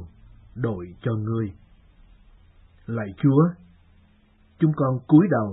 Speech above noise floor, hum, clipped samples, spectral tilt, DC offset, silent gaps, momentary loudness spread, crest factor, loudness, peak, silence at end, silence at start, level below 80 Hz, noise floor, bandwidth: 36 dB; none; under 0.1%; -13.5 dB/octave; under 0.1%; none; 15 LU; 20 dB; -23 LUFS; -4 dBFS; 0 s; 0 s; -54 dBFS; -58 dBFS; 4 kHz